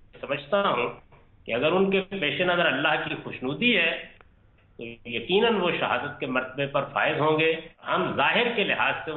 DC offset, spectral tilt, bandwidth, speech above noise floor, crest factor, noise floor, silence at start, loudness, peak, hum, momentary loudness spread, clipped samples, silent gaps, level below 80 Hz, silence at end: under 0.1%; -8.5 dB/octave; 4.3 kHz; 33 dB; 16 dB; -58 dBFS; 0.15 s; -25 LUFS; -10 dBFS; none; 11 LU; under 0.1%; none; -58 dBFS; 0 s